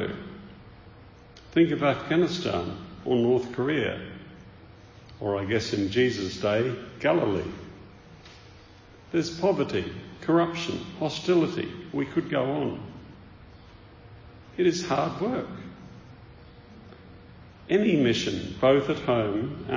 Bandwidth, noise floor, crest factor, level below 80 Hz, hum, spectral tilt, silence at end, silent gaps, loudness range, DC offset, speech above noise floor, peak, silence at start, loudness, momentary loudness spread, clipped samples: 7.6 kHz; -50 dBFS; 20 dB; -54 dBFS; none; -6 dB/octave; 0 s; none; 5 LU; under 0.1%; 25 dB; -8 dBFS; 0 s; -26 LUFS; 22 LU; under 0.1%